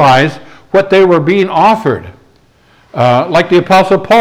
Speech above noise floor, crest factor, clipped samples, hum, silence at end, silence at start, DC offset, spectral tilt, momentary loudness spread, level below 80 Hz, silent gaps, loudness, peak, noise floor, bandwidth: 39 dB; 10 dB; under 0.1%; none; 0 s; 0 s; under 0.1%; -6.5 dB/octave; 8 LU; -46 dBFS; none; -9 LUFS; 0 dBFS; -47 dBFS; 19 kHz